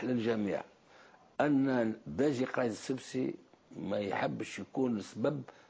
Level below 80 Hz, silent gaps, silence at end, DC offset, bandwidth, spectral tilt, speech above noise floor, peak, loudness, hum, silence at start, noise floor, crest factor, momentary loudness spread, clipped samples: -70 dBFS; none; 0.2 s; under 0.1%; 8 kHz; -6.5 dB/octave; 26 dB; -18 dBFS; -34 LUFS; none; 0 s; -60 dBFS; 16 dB; 11 LU; under 0.1%